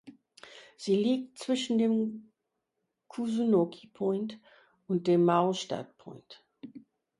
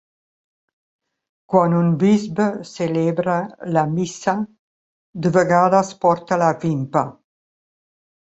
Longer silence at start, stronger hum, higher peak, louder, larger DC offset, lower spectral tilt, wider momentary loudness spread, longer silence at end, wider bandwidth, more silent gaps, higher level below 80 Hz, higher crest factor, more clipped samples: second, 0.05 s vs 1.5 s; neither; second, -12 dBFS vs -2 dBFS; second, -29 LUFS vs -19 LUFS; neither; about the same, -6.5 dB/octave vs -7 dB/octave; first, 24 LU vs 8 LU; second, 0.4 s vs 1.15 s; first, 11.5 kHz vs 8.2 kHz; second, none vs 4.59-5.13 s; second, -76 dBFS vs -60 dBFS; about the same, 20 dB vs 18 dB; neither